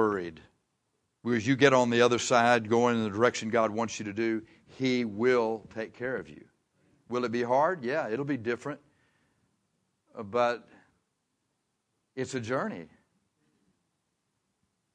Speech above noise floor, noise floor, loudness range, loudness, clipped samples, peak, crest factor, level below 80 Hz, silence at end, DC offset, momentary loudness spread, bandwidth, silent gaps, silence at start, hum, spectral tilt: 51 dB; -79 dBFS; 14 LU; -28 LUFS; under 0.1%; -6 dBFS; 24 dB; -72 dBFS; 2.1 s; under 0.1%; 16 LU; 10.5 kHz; none; 0 s; none; -5 dB/octave